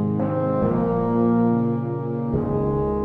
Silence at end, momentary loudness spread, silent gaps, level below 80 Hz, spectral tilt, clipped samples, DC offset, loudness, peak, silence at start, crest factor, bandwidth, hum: 0 s; 6 LU; none; -40 dBFS; -12 dB/octave; under 0.1%; under 0.1%; -22 LUFS; -8 dBFS; 0 s; 12 dB; 3.6 kHz; none